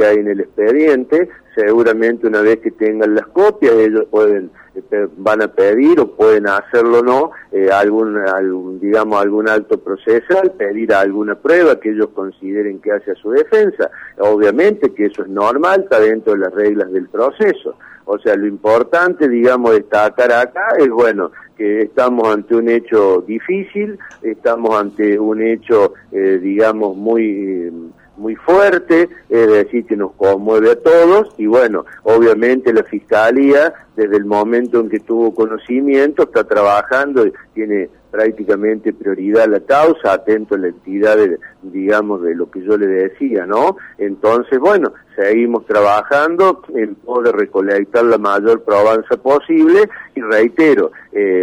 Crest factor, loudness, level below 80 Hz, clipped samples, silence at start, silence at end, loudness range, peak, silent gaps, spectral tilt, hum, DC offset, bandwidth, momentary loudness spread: 10 dB; -13 LUFS; -56 dBFS; under 0.1%; 0 s; 0 s; 3 LU; -2 dBFS; none; -6.5 dB/octave; none; under 0.1%; 9.6 kHz; 9 LU